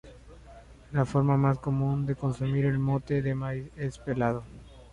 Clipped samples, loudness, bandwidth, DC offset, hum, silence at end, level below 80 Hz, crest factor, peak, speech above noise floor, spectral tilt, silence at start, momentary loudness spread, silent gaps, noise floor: under 0.1%; -29 LUFS; 9.8 kHz; under 0.1%; none; 0.05 s; -50 dBFS; 16 dB; -12 dBFS; 23 dB; -9 dB/octave; 0.05 s; 10 LU; none; -50 dBFS